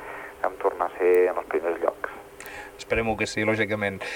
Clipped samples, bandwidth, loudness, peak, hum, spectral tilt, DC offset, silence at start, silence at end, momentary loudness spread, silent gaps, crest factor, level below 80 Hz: under 0.1%; 19 kHz; -25 LUFS; -8 dBFS; none; -5 dB/octave; under 0.1%; 0 s; 0 s; 17 LU; none; 18 dB; -50 dBFS